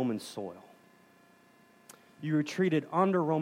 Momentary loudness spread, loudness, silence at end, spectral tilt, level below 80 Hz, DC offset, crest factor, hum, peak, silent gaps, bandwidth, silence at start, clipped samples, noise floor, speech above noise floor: 15 LU; -31 LUFS; 0 s; -7 dB/octave; -84 dBFS; under 0.1%; 18 dB; 60 Hz at -65 dBFS; -14 dBFS; none; 16 kHz; 0 s; under 0.1%; -62 dBFS; 32 dB